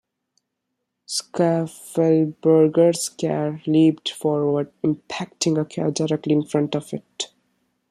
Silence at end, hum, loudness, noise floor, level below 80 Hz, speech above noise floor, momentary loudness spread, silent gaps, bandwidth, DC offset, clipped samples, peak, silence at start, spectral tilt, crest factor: 0.65 s; none; -21 LUFS; -79 dBFS; -66 dBFS; 58 dB; 11 LU; none; 13 kHz; under 0.1%; under 0.1%; -4 dBFS; 1.1 s; -5.5 dB/octave; 16 dB